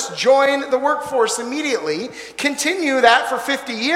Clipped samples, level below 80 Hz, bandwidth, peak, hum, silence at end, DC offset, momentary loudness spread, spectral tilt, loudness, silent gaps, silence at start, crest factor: under 0.1%; -62 dBFS; 16 kHz; 0 dBFS; none; 0 s; under 0.1%; 9 LU; -2 dB/octave; -18 LUFS; none; 0 s; 18 dB